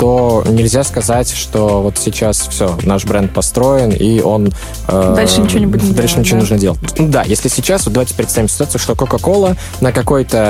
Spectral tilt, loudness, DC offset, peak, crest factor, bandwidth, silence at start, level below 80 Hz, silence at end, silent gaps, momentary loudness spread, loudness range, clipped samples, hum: -5 dB/octave; -12 LUFS; under 0.1%; 0 dBFS; 12 dB; 16.5 kHz; 0 s; -26 dBFS; 0 s; none; 4 LU; 2 LU; under 0.1%; none